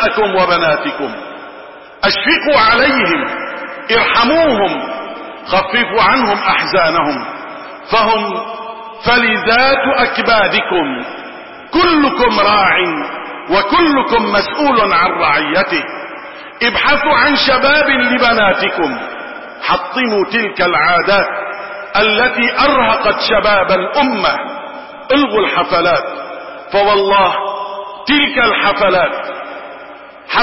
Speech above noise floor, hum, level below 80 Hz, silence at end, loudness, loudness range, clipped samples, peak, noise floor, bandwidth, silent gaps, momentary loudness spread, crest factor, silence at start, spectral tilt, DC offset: 22 dB; none; -42 dBFS; 0 s; -12 LUFS; 2 LU; under 0.1%; 0 dBFS; -34 dBFS; 5.8 kHz; none; 16 LU; 14 dB; 0 s; -7.5 dB/octave; 0.6%